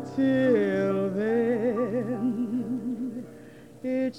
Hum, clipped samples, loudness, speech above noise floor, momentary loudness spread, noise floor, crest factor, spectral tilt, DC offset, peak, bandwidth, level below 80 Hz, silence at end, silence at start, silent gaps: none; under 0.1%; -27 LUFS; 23 dB; 12 LU; -47 dBFS; 14 dB; -8 dB/octave; under 0.1%; -12 dBFS; 10.5 kHz; -64 dBFS; 0 s; 0 s; none